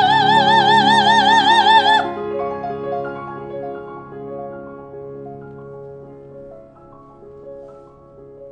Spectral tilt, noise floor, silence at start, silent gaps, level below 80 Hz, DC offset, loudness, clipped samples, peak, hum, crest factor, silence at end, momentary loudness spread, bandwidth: -3.5 dB/octave; -43 dBFS; 0 s; none; -54 dBFS; under 0.1%; -14 LUFS; under 0.1%; 0 dBFS; none; 18 dB; 0 s; 25 LU; 9.8 kHz